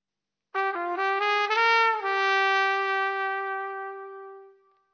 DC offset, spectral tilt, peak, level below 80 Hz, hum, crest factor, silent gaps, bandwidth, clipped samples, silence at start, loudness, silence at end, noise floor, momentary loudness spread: under 0.1%; 1 dB/octave; -10 dBFS; under -90 dBFS; none; 18 dB; none; 6.6 kHz; under 0.1%; 0.55 s; -24 LUFS; 0.45 s; -88 dBFS; 15 LU